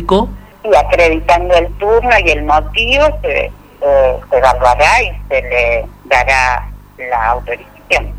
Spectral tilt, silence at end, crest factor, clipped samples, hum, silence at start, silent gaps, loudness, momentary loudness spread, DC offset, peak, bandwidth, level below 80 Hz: -4.5 dB/octave; 0 s; 12 dB; under 0.1%; 50 Hz at -25 dBFS; 0 s; none; -12 LUFS; 10 LU; under 0.1%; 0 dBFS; 15 kHz; -24 dBFS